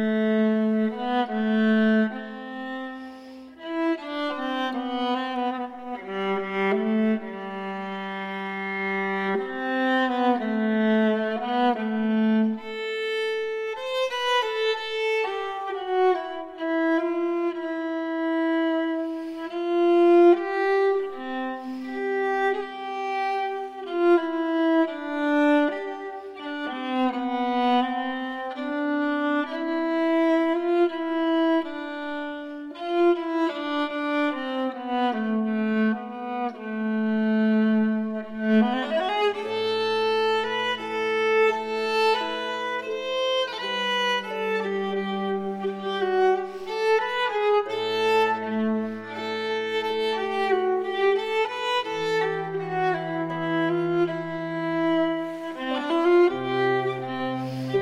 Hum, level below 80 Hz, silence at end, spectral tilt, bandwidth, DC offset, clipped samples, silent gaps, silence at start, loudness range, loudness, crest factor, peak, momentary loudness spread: none; -70 dBFS; 0 s; -6 dB/octave; 11 kHz; under 0.1%; under 0.1%; none; 0 s; 4 LU; -25 LUFS; 16 dB; -8 dBFS; 10 LU